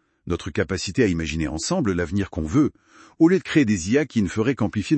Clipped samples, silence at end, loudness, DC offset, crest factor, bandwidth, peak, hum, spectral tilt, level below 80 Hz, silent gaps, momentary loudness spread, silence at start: under 0.1%; 0 s; -22 LUFS; under 0.1%; 18 dB; 8.8 kHz; -4 dBFS; none; -6 dB/octave; -42 dBFS; none; 7 LU; 0.25 s